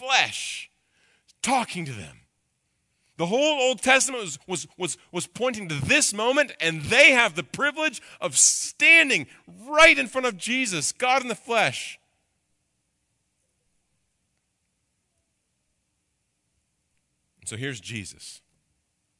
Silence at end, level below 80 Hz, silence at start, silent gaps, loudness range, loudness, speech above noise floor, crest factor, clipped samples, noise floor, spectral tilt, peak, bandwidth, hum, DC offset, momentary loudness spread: 0.85 s; -60 dBFS; 0 s; none; 20 LU; -21 LUFS; 52 dB; 24 dB; under 0.1%; -75 dBFS; -1.5 dB/octave; -2 dBFS; 11.5 kHz; none; under 0.1%; 19 LU